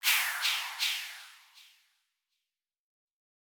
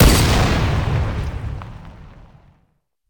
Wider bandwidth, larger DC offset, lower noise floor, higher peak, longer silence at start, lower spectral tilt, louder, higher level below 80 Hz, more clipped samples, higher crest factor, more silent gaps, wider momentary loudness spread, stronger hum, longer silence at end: about the same, over 20 kHz vs 19.5 kHz; neither; first, -90 dBFS vs -64 dBFS; second, -14 dBFS vs -2 dBFS; about the same, 0.05 s vs 0 s; second, 9.5 dB/octave vs -5 dB/octave; second, -29 LUFS vs -19 LUFS; second, under -90 dBFS vs -24 dBFS; neither; first, 22 dB vs 16 dB; neither; second, 20 LU vs 23 LU; neither; first, 1.95 s vs 1 s